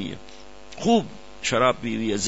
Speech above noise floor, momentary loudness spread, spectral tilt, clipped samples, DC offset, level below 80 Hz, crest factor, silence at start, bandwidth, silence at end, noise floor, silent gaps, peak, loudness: 23 dB; 19 LU; -4 dB/octave; under 0.1%; 0.8%; -52 dBFS; 20 dB; 0 s; 8 kHz; 0 s; -46 dBFS; none; -6 dBFS; -23 LUFS